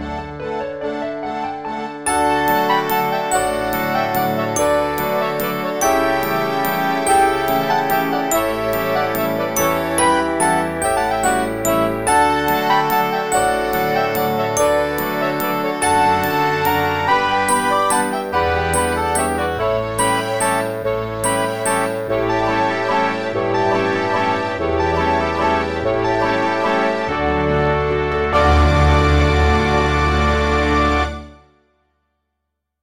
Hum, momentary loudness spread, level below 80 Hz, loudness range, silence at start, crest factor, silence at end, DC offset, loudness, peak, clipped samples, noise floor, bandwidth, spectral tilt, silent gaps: none; 5 LU; -30 dBFS; 3 LU; 0 s; 14 dB; 1.45 s; 0.5%; -18 LUFS; -4 dBFS; under 0.1%; -76 dBFS; 17 kHz; -4.5 dB/octave; none